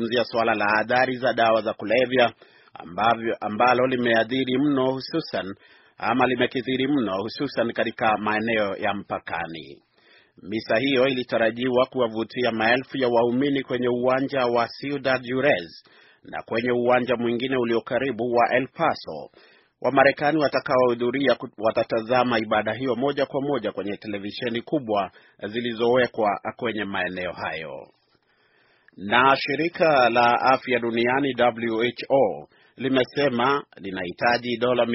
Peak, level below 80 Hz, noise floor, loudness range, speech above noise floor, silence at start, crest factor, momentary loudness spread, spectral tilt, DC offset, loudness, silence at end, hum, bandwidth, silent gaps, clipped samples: -2 dBFS; -62 dBFS; -64 dBFS; 5 LU; 41 dB; 0 s; 22 dB; 11 LU; -3 dB/octave; under 0.1%; -23 LUFS; 0 s; none; 6 kHz; none; under 0.1%